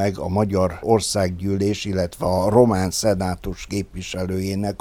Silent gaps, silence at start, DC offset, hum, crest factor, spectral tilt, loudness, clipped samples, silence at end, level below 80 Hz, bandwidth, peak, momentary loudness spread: none; 0 s; under 0.1%; none; 18 dB; -5.5 dB/octave; -21 LUFS; under 0.1%; 0.05 s; -42 dBFS; 17.5 kHz; -2 dBFS; 11 LU